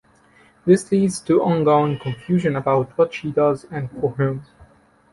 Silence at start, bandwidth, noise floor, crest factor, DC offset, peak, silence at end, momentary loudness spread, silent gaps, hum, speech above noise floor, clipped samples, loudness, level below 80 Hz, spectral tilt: 0.65 s; 11.5 kHz; -54 dBFS; 18 dB; under 0.1%; -2 dBFS; 0.7 s; 10 LU; none; none; 35 dB; under 0.1%; -20 LUFS; -54 dBFS; -7 dB/octave